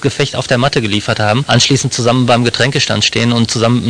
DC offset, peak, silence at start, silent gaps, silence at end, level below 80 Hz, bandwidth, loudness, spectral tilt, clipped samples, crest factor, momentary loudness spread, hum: 0.3%; 0 dBFS; 0 s; none; 0 s; -42 dBFS; 10 kHz; -12 LUFS; -4.5 dB/octave; under 0.1%; 12 dB; 4 LU; none